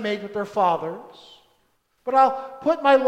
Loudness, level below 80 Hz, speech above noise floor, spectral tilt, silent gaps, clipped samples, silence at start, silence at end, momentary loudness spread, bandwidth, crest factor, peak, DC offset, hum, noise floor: -22 LUFS; -68 dBFS; 45 dB; -5.5 dB/octave; none; under 0.1%; 0 s; 0 s; 15 LU; 9.4 kHz; 18 dB; -6 dBFS; under 0.1%; none; -67 dBFS